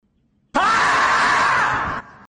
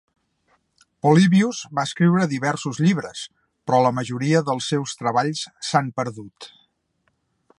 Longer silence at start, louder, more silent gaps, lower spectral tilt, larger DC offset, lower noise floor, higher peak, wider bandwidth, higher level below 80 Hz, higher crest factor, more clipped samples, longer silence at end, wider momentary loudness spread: second, 0.55 s vs 1.05 s; first, -17 LUFS vs -21 LUFS; neither; second, -2.5 dB/octave vs -6 dB/octave; neither; second, -63 dBFS vs -70 dBFS; second, -6 dBFS vs -2 dBFS; second, 10 kHz vs 11.5 kHz; first, -48 dBFS vs -66 dBFS; second, 14 dB vs 20 dB; neither; second, 0.25 s vs 1.1 s; second, 8 LU vs 18 LU